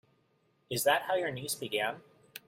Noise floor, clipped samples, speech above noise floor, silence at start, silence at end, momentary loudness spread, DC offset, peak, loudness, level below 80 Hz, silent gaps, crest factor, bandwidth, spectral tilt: -72 dBFS; under 0.1%; 40 dB; 0.7 s; 0.1 s; 14 LU; under 0.1%; -12 dBFS; -32 LUFS; -74 dBFS; none; 22 dB; 16 kHz; -2.5 dB/octave